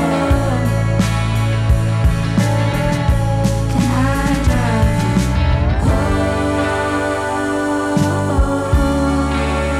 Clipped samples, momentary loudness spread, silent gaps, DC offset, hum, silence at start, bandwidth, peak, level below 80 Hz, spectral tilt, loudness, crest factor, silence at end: under 0.1%; 2 LU; none; under 0.1%; none; 0 s; 14.5 kHz; -4 dBFS; -22 dBFS; -6.5 dB/octave; -16 LUFS; 12 dB; 0 s